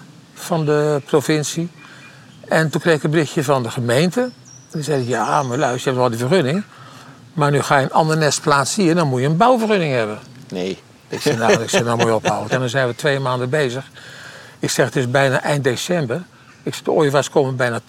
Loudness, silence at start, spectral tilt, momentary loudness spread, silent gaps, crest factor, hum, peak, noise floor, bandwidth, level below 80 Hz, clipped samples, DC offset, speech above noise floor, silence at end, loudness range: -18 LUFS; 0 s; -5 dB/octave; 13 LU; none; 16 dB; none; -2 dBFS; -42 dBFS; 16.5 kHz; -60 dBFS; under 0.1%; under 0.1%; 24 dB; 0.1 s; 3 LU